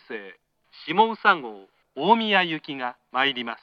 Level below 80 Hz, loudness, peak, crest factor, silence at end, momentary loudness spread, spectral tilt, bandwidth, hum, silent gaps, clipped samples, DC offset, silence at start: -80 dBFS; -23 LUFS; -4 dBFS; 20 dB; 0.05 s; 19 LU; -6 dB/octave; 6.6 kHz; none; none; under 0.1%; under 0.1%; 0.1 s